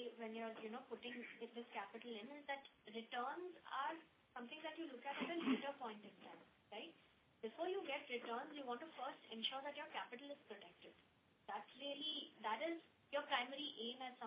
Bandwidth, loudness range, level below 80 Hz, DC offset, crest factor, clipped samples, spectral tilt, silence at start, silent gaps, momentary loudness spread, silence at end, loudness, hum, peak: 5 kHz; 3 LU; under -90 dBFS; under 0.1%; 24 dB; under 0.1%; -0.5 dB/octave; 0 s; none; 13 LU; 0 s; -49 LUFS; none; -26 dBFS